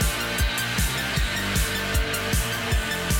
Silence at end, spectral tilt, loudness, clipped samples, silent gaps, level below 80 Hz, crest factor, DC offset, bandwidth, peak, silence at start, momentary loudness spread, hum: 0 s; -3 dB/octave; -24 LUFS; under 0.1%; none; -30 dBFS; 12 dB; under 0.1%; 17 kHz; -12 dBFS; 0 s; 1 LU; none